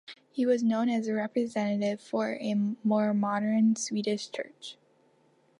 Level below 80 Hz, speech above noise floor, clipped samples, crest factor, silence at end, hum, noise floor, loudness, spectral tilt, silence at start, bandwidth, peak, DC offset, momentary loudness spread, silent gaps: -80 dBFS; 38 dB; under 0.1%; 14 dB; 0.85 s; none; -66 dBFS; -29 LUFS; -5.5 dB/octave; 0.1 s; 11 kHz; -14 dBFS; under 0.1%; 12 LU; none